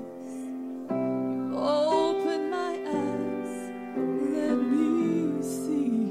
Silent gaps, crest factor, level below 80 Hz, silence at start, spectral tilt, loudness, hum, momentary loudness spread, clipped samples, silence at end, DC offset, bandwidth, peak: none; 14 dB; -74 dBFS; 0 s; -6 dB/octave; -28 LUFS; none; 11 LU; under 0.1%; 0 s; under 0.1%; 14.5 kHz; -12 dBFS